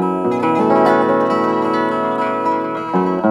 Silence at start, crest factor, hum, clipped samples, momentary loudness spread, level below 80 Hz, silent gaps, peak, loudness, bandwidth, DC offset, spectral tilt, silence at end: 0 s; 14 dB; none; under 0.1%; 5 LU; -60 dBFS; none; -2 dBFS; -16 LUFS; 12 kHz; under 0.1%; -7.5 dB/octave; 0 s